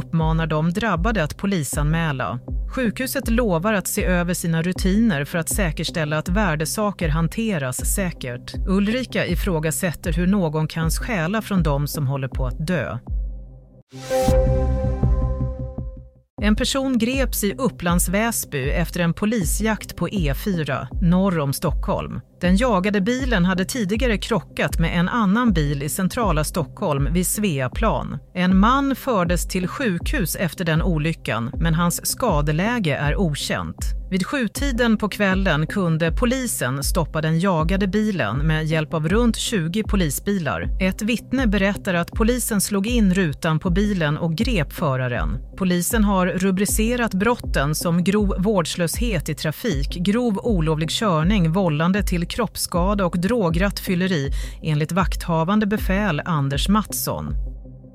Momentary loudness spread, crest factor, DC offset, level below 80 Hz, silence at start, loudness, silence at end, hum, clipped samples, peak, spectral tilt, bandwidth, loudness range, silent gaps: 6 LU; 16 dB; under 0.1%; -30 dBFS; 0 s; -21 LUFS; 0.05 s; none; under 0.1%; -6 dBFS; -5.5 dB/octave; 16 kHz; 2 LU; 13.82-13.87 s, 16.30-16.37 s